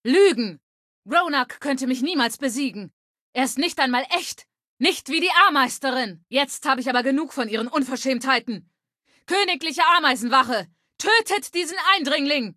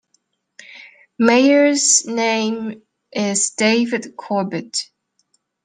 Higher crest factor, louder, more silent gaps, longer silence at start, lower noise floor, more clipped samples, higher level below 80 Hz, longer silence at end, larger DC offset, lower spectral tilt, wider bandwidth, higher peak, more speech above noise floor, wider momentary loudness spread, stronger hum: about the same, 18 dB vs 18 dB; second, -21 LUFS vs -17 LUFS; first, 0.63-1.03 s, 2.93-3.15 s, 3.21-3.33 s, 4.67-4.77 s vs none; second, 0.05 s vs 0.7 s; about the same, -66 dBFS vs -66 dBFS; neither; about the same, -72 dBFS vs -70 dBFS; second, 0.05 s vs 0.8 s; neither; about the same, -2 dB/octave vs -2.5 dB/octave; first, 14.5 kHz vs 10 kHz; about the same, -4 dBFS vs -2 dBFS; second, 45 dB vs 49 dB; second, 10 LU vs 15 LU; neither